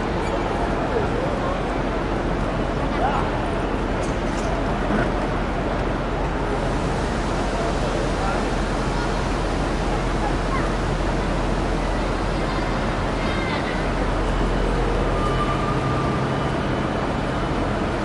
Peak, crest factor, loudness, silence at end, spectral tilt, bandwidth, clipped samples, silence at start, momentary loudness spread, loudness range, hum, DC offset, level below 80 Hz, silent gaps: -8 dBFS; 14 dB; -23 LUFS; 0 s; -6 dB/octave; 11.5 kHz; under 0.1%; 0 s; 2 LU; 1 LU; none; under 0.1%; -28 dBFS; none